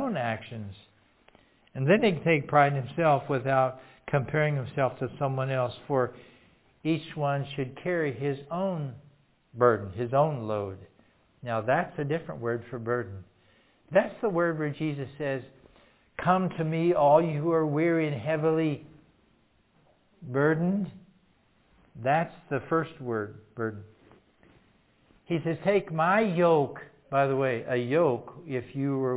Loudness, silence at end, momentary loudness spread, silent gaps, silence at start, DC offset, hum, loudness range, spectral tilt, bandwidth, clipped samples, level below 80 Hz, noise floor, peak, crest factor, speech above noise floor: -28 LUFS; 0 s; 12 LU; none; 0 s; under 0.1%; none; 7 LU; -11 dB/octave; 4 kHz; under 0.1%; -64 dBFS; -66 dBFS; -6 dBFS; 22 dB; 39 dB